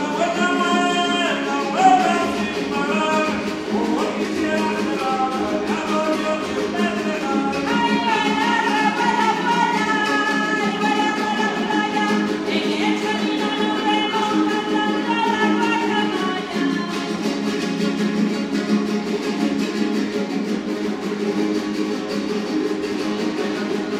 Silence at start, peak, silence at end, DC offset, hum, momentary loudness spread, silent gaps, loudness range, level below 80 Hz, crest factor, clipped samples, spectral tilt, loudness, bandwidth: 0 s; -2 dBFS; 0 s; under 0.1%; none; 5 LU; none; 4 LU; -56 dBFS; 18 dB; under 0.1%; -4.5 dB/octave; -20 LUFS; 14.5 kHz